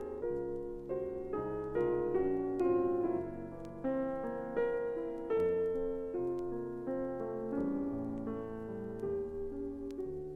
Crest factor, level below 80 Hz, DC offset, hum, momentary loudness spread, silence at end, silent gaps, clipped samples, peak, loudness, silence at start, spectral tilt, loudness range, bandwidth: 14 dB; -56 dBFS; under 0.1%; none; 9 LU; 0 s; none; under 0.1%; -22 dBFS; -37 LUFS; 0 s; -9.5 dB/octave; 4 LU; 4.8 kHz